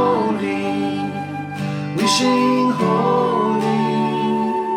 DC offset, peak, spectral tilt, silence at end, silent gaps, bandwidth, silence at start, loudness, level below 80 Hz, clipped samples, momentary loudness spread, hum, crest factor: under 0.1%; -4 dBFS; -5 dB/octave; 0 s; none; 15.5 kHz; 0 s; -19 LUFS; -62 dBFS; under 0.1%; 9 LU; none; 16 dB